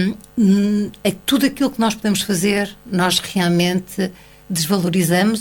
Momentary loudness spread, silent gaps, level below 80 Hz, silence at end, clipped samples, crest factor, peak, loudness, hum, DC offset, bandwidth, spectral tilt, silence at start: 6 LU; none; -50 dBFS; 0 s; under 0.1%; 16 dB; -2 dBFS; -18 LUFS; none; under 0.1%; 19 kHz; -4.5 dB/octave; 0 s